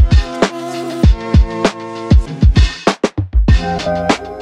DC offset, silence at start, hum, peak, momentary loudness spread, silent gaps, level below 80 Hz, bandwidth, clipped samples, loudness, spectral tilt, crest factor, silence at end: under 0.1%; 0 s; none; 0 dBFS; 6 LU; none; -16 dBFS; 10 kHz; under 0.1%; -15 LUFS; -6.5 dB/octave; 12 dB; 0 s